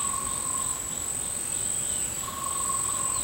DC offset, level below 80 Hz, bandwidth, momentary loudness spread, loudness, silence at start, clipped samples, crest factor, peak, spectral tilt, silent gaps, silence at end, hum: under 0.1%; -50 dBFS; 16 kHz; 4 LU; -27 LUFS; 0 s; under 0.1%; 14 dB; -16 dBFS; -1 dB/octave; none; 0 s; none